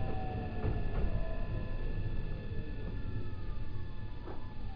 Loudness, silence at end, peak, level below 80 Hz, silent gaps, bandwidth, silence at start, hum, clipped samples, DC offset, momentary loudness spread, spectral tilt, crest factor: -41 LUFS; 0 s; -20 dBFS; -38 dBFS; none; 5.2 kHz; 0 s; none; under 0.1%; under 0.1%; 8 LU; -9.5 dB/octave; 14 dB